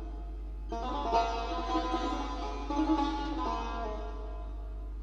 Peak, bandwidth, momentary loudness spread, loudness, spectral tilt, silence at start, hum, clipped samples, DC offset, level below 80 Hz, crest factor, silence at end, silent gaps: -14 dBFS; 7.6 kHz; 13 LU; -34 LUFS; -6 dB/octave; 0 s; none; under 0.1%; under 0.1%; -38 dBFS; 18 dB; 0 s; none